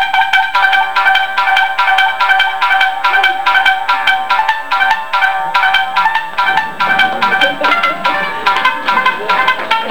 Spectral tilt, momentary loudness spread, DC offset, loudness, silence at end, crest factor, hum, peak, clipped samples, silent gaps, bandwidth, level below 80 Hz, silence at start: -1.5 dB/octave; 3 LU; 4%; -11 LUFS; 0 s; 12 dB; none; 0 dBFS; under 0.1%; none; over 20 kHz; -50 dBFS; 0 s